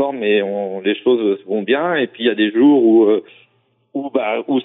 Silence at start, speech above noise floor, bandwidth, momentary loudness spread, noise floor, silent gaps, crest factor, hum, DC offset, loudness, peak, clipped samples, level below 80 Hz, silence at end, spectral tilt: 0 s; 44 dB; 4 kHz; 10 LU; -60 dBFS; none; 12 dB; none; under 0.1%; -16 LUFS; -4 dBFS; under 0.1%; -70 dBFS; 0 s; -3.5 dB/octave